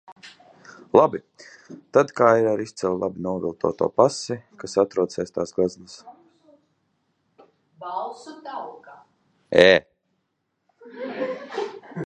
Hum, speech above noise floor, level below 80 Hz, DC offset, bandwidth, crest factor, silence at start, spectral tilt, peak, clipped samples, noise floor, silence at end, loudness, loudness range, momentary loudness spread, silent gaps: none; 54 dB; -60 dBFS; under 0.1%; 9.2 kHz; 24 dB; 0.1 s; -5 dB/octave; 0 dBFS; under 0.1%; -75 dBFS; 0 s; -22 LUFS; 11 LU; 19 LU; 0.12-0.16 s